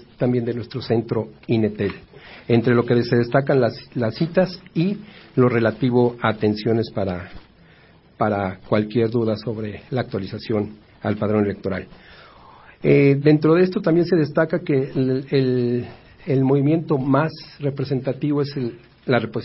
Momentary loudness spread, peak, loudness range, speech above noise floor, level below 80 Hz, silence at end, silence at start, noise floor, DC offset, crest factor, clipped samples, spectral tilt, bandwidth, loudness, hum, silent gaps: 11 LU; -2 dBFS; 6 LU; 31 dB; -52 dBFS; 0 s; 0.2 s; -51 dBFS; under 0.1%; 18 dB; under 0.1%; -12 dB/octave; 5.8 kHz; -21 LUFS; none; none